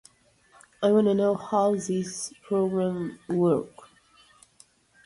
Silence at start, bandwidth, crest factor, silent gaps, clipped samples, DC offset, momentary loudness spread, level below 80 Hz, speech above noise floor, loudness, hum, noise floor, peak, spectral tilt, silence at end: 0.8 s; 11.5 kHz; 16 dB; none; under 0.1%; under 0.1%; 11 LU; -66 dBFS; 36 dB; -26 LUFS; none; -61 dBFS; -10 dBFS; -6.5 dB/octave; 1.4 s